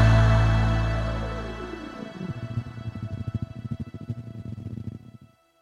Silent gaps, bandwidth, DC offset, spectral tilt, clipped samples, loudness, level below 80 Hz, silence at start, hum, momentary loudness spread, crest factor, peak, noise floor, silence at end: none; 7.6 kHz; under 0.1%; -7.5 dB/octave; under 0.1%; -28 LUFS; -32 dBFS; 0 s; none; 17 LU; 18 dB; -8 dBFS; -52 dBFS; 0.5 s